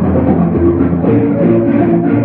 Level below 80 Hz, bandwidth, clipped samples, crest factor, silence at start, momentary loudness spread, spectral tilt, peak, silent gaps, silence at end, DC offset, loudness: -32 dBFS; 3.7 kHz; under 0.1%; 10 dB; 0 s; 1 LU; -14 dB/octave; 0 dBFS; none; 0 s; under 0.1%; -11 LUFS